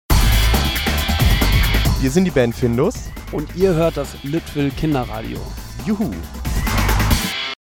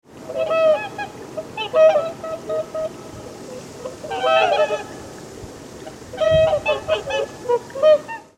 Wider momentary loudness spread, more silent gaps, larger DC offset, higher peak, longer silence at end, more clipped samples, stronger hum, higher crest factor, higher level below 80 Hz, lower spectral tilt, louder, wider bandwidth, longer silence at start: second, 11 LU vs 20 LU; neither; neither; about the same, -2 dBFS vs -4 dBFS; about the same, 0.1 s vs 0.15 s; neither; neither; about the same, 16 dB vs 16 dB; first, -22 dBFS vs -48 dBFS; about the same, -5 dB/octave vs -4 dB/octave; about the same, -19 LUFS vs -20 LUFS; first, 19.5 kHz vs 12.5 kHz; about the same, 0.1 s vs 0.15 s